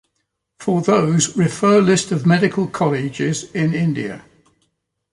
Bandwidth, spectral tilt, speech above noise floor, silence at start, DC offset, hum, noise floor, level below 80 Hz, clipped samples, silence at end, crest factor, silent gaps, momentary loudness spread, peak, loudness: 11.5 kHz; -5.5 dB/octave; 56 dB; 0.6 s; under 0.1%; none; -73 dBFS; -56 dBFS; under 0.1%; 0.9 s; 14 dB; none; 9 LU; -4 dBFS; -17 LUFS